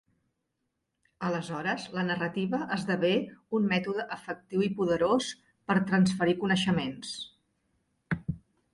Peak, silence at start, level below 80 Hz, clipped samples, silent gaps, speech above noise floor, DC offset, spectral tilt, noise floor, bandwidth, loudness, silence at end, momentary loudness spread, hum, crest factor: -12 dBFS; 1.2 s; -62 dBFS; under 0.1%; none; 53 dB; under 0.1%; -6 dB/octave; -81 dBFS; 11.5 kHz; -30 LUFS; 0.35 s; 12 LU; none; 18 dB